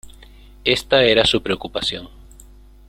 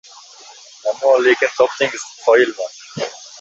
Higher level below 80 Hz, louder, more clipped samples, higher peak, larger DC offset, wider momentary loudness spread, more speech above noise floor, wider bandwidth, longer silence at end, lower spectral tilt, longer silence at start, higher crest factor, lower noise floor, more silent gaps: first, -42 dBFS vs -66 dBFS; about the same, -18 LUFS vs -17 LUFS; neither; about the same, 0 dBFS vs 0 dBFS; neither; second, 10 LU vs 14 LU; about the same, 26 dB vs 26 dB; first, 16 kHz vs 8 kHz; first, 0.8 s vs 0 s; about the same, -3.5 dB/octave vs -3 dB/octave; second, 0.05 s vs 0.85 s; about the same, 20 dB vs 18 dB; about the same, -44 dBFS vs -41 dBFS; neither